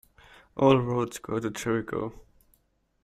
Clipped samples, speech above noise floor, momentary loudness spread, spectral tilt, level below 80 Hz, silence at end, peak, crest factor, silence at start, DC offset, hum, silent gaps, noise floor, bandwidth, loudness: under 0.1%; 43 dB; 13 LU; -6.5 dB/octave; -58 dBFS; 0.85 s; -6 dBFS; 22 dB; 0.55 s; under 0.1%; none; none; -69 dBFS; 15 kHz; -27 LUFS